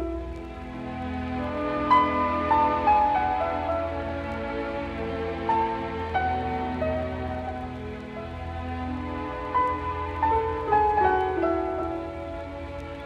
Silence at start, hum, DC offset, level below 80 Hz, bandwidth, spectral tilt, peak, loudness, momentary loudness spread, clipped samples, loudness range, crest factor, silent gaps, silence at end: 0 s; none; under 0.1%; -42 dBFS; 9.2 kHz; -7.5 dB/octave; -8 dBFS; -27 LUFS; 14 LU; under 0.1%; 6 LU; 18 dB; none; 0 s